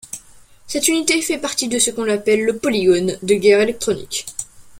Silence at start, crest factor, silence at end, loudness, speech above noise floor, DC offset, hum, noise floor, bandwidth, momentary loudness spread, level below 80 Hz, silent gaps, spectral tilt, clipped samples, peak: 0.15 s; 18 dB; 0 s; -17 LUFS; 28 dB; under 0.1%; none; -45 dBFS; 16.5 kHz; 12 LU; -52 dBFS; none; -3 dB/octave; under 0.1%; 0 dBFS